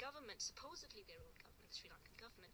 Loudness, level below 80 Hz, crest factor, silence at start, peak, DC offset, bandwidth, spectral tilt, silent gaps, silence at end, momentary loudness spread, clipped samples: -53 LUFS; -72 dBFS; 22 dB; 0 s; -34 dBFS; under 0.1%; over 20 kHz; -1 dB/octave; none; 0 s; 13 LU; under 0.1%